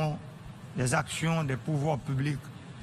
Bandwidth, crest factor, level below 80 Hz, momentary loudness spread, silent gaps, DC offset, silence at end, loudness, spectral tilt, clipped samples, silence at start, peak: 13.5 kHz; 20 dB; -54 dBFS; 15 LU; none; under 0.1%; 0 s; -31 LUFS; -5.5 dB/octave; under 0.1%; 0 s; -12 dBFS